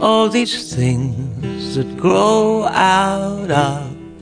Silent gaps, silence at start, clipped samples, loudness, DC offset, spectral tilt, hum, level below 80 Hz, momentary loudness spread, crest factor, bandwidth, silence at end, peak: none; 0 s; under 0.1%; -16 LUFS; under 0.1%; -5.5 dB/octave; none; -44 dBFS; 11 LU; 16 dB; 10.5 kHz; 0 s; 0 dBFS